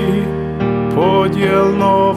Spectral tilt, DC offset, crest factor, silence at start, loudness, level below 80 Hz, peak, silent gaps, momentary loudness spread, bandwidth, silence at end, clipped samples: -7.5 dB/octave; under 0.1%; 14 dB; 0 s; -14 LUFS; -40 dBFS; 0 dBFS; none; 6 LU; 13.5 kHz; 0 s; under 0.1%